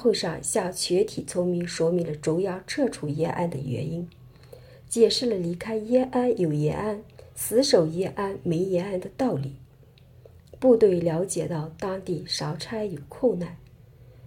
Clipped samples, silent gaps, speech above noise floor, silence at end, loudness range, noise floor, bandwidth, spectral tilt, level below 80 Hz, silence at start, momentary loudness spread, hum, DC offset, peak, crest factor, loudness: under 0.1%; none; 28 dB; 0 s; 3 LU; -53 dBFS; 17 kHz; -5 dB/octave; -58 dBFS; 0 s; 11 LU; none; under 0.1%; -6 dBFS; 20 dB; -26 LUFS